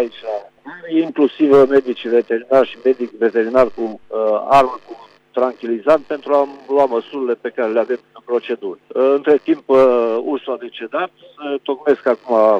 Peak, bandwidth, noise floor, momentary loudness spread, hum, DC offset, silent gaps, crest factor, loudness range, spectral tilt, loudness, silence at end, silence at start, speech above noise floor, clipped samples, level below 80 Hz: -4 dBFS; 8 kHz; -35 dBFS; 13 LU; none; under 0.1%; none; 14 dB; 3 LU; -6.5 dB/octave; -17 LUFS; 0 s; 0 s; 19 dB; under 0.1%; -54 dBFS